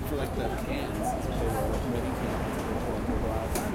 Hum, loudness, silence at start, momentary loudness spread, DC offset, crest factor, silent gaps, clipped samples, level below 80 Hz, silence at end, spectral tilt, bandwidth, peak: none; -31 LUFS; 0 s; 2 LU; under 0.1%; 14 dB; none; under 0.1%; -36 dBFS; 0 s; -6 dB/octave; 16.5 kHz; -16 dBFS